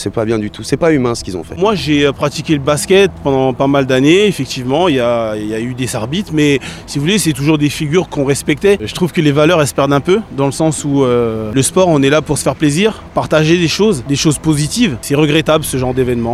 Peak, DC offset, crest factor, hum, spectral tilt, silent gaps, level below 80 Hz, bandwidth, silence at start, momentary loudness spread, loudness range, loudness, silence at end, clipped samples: 0 dBFS; under 0.1%; 12 dB; none; -5 dB/octave; none; -38 dBFS; 15 kHz; 0 s; 7 LU; 2 LU; -13 LUFS; 0 s; under 0.1%